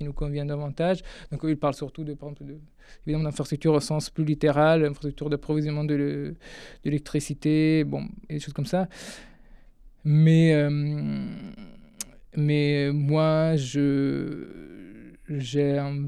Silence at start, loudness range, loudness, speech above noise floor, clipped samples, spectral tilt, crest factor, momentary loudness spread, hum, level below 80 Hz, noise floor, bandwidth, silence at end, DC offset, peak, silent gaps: 0 s; 4 LU; -25 LUFS; 25 dB; under 0.1%; -7 dB/octave; 16 dB; 19 LU; none; -46 dBFS; -50 dBFS; 12 kHz; 0 s; under 0.1%; -8 dBFS; none